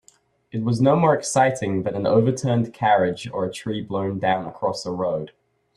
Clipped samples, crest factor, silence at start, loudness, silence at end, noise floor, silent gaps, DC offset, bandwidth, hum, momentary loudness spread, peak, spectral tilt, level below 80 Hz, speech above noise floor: under 0.1%; 18 dB; 0.55 s; -22 LUFS; 0.5 s; -58 dBFS; none; under 0.1%; 12.5 kHz; none; 9 LU; -4 dBFS; -6 dB/octave; -60 dBFS; 37 dB